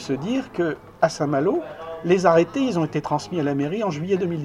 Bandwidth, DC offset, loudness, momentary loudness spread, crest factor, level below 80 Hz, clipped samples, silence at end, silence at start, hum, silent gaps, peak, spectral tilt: 11.5 kHz; under 0.1%; -22 LUFS; 8 LU; 20 dB; -56 dBFS; under 0.1%; 0 s; 0 s; none; none; -2 dBFS; -6.5 dB/octave